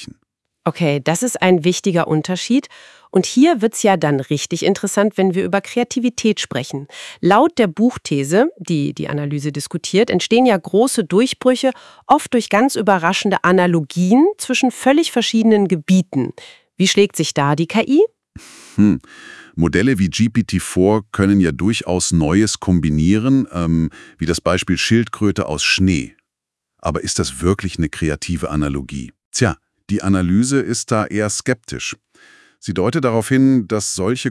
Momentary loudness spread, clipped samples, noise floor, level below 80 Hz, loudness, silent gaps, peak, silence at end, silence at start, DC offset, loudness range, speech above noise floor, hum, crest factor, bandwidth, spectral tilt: 9 LU; under 0.1%; -81 dBFS; -44 dBFS; -17 LUFS; 29.25-29.32 s; 0 dBFS; 0 s; 0 s; under 0.1%; 4 LU; 65 dB; none; 16 dB; 12 kHz; -5 dB/octave